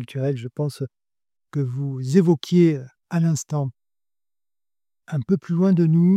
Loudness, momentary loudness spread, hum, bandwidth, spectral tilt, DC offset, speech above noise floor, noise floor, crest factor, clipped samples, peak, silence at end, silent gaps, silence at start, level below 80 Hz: -22 LUFS; 13 LU; none; 12 kHz; -8 dB/octave; under 0.1%; over 70 dB; under -90 dBFS; 18 dB; under 0.1%; -4 dBFS; 0 s; none; 0 s; -66 dBFS